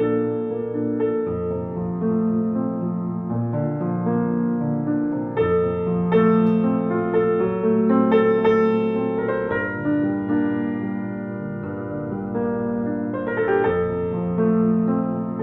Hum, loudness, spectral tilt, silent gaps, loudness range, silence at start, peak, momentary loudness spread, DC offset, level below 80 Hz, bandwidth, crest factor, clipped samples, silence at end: none; -22 LUFS; -10.5 dB/octave; none; 6 LU; 0 s; -6 dBFS; 9 LU; under 0.1%; -54 dBFS; 3.9 kHz; 16 dB; under 0.1%; 0 s